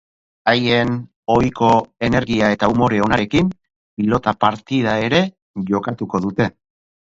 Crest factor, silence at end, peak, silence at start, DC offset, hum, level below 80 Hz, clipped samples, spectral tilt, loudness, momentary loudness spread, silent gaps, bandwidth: 18 dB; 0.5 s; 0 dBFS; 0.45 s; under 0.1%; none; -44 dBFS; under 0.1%; -6.5 dB/octave; -18 LUFS; 7 LU; 1.16-1.23 s, 3.76-3.97 s, 5.42-5.54 s; 7.8 kHz